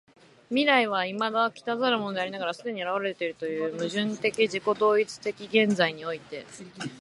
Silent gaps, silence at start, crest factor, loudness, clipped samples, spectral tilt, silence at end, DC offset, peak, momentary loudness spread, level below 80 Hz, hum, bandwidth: none; 0.5 s; 22 dB; -27 LUFS; under 0.1%; -4.5 dB/octave; 0 s; under 0.1%; -6 dBFS; 13 LU; -74 dBFS; none; 11.5 kHz